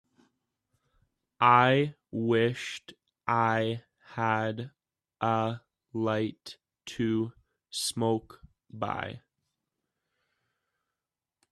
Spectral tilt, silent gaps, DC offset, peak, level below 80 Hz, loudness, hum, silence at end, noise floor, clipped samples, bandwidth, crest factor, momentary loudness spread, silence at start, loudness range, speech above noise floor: -5 dB/octave; none; under 0.1%; -8 dBFS; -68 dBFS; -29 LUFS; none; 2.35 s; under -90 dBFS; under 0.1%; 13.5 kHz; 24 dB; 19 LU; 1.4 s; 9 LU; over 62 dB